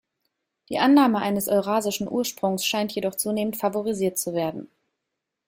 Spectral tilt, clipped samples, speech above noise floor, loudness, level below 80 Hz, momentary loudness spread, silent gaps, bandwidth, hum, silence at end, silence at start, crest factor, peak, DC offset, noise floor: -4 dB/octave; under 0.1%; 59 dB; -24 LUFS; -64 dBFS; 9 LU; none; 16.5 kHz; none; 0.8 s; 0.7 s; 18 dB; -6 dBFS; under 0.1%; -83 dBFS